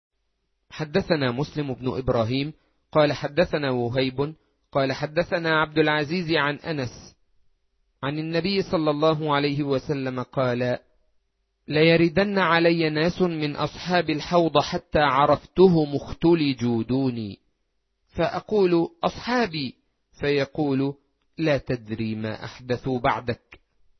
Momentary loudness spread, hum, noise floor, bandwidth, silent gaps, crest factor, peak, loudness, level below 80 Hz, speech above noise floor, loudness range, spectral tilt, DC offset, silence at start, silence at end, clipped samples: 11 LU; none; -74 dBFS; 6.4 kHz; none; 20 dB; -4 dBFS; -24 LUFS; -50 dBFS; 51 dB; 5 LU; -7 dB/octave; under 0.1%; 0.75 s; 0.65 s; under 0.1%